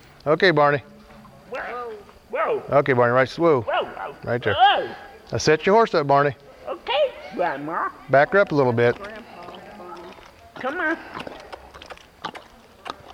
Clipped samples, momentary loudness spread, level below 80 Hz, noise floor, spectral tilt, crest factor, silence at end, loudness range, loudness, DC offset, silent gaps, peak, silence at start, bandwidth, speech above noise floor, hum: under 0.1%; 22 LU; -56 dBFS; -46 dBFS; -5.5 dB/octave; 18 dB; 0 s; 12 LU; -21 LUFS; under 0.1%; none; -4 dBFS; 0.25 s; 13 kHz; 26 dB; none